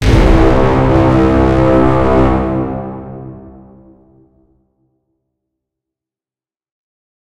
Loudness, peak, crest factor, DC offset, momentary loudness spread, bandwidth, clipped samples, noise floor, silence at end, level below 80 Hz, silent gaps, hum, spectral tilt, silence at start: -11 LUFS; 0 dBFS; 14 dB; under 0.1%; 18 LU; 11 kHz; 0.1%; under -90 dBFS; 3.55 s; -20 dBFS; none; none; -8 dB/octave; 0 s